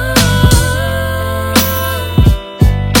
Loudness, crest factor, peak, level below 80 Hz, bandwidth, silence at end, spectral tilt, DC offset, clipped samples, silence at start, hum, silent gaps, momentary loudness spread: -12 LUFS; 12 dB; 0 dBFS; -18 dBFS; over 20 kHz; 0 s; -4.5 dB/octave; under 0.1%; 0.8%; 0 s; none; none; 7 LU